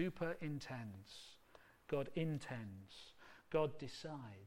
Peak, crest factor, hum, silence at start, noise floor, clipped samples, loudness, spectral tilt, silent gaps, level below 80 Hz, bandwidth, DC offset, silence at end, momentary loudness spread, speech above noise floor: -26 dBFS; 20 dB; none; 0 s; -67 dBFS; under 0.1%; -45 LUFS; -6.5 dB/octave; none; -68 dBFS; 16.5 kHz; under 0.1%; 0 s; 20 LU; 23 dB